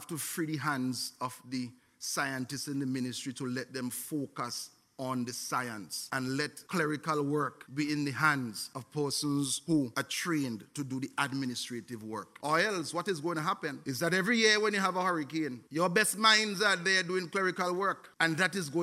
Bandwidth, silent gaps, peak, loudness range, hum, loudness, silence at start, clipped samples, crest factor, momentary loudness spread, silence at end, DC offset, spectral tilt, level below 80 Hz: 16 kHz; none; -10 dBFS; 8 LU; none; -32 LUFS; 0 s; under 0.1%; 22 dB; 13 LU; 0 s; under 0.1%; -3.5 dB/octave; -76 dBFS